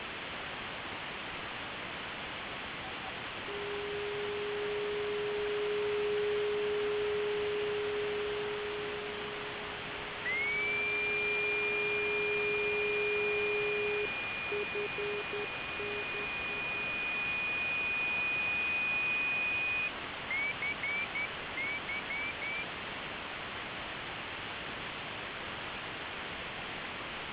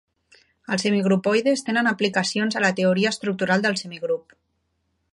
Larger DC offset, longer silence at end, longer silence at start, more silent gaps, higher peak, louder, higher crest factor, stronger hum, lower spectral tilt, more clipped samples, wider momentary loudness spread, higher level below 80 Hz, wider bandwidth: neither; second, 0 s vs 0.95 s; second, 0 s vs 0.7 s; neither; second, -22 dBFS vs -6 dBFS; second, -34 LUFS vs -22 LUFS; about the same, 14 dB vs 18 dB; neither; second, -1 dB/octave vs -4.5 dB/octave; neither; about the same, 9 LU vs 8 LU; first, -60 dBFS vs -68 dBFS; second, 4 kHz vs 11.5 kHz